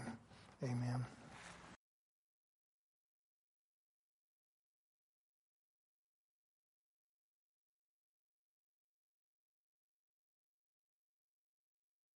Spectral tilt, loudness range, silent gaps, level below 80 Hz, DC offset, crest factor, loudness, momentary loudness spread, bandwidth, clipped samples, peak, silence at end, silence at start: -7 dB/octave; 15 LU; none; -82 dBFS; under 0.1%; 22 dB; -47 LUFS; 20 LU; 11.5 kHz; under 0.1%; -32 dBFS; 10.4 s; 0 s